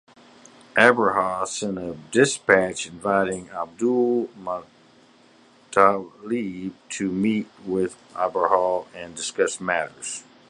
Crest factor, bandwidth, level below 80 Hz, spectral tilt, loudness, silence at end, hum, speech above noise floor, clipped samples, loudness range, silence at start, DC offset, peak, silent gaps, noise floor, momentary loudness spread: 24 dB; 11.5 kHz; -62 dBFS; -4 dB/octave; -23 LUFS; 0.3 s; none; 32 dB; under 0.1%; 4 LU; 0.75 s; under 0.1%; 0 dBFS; none; -54 dBFS; 14 LU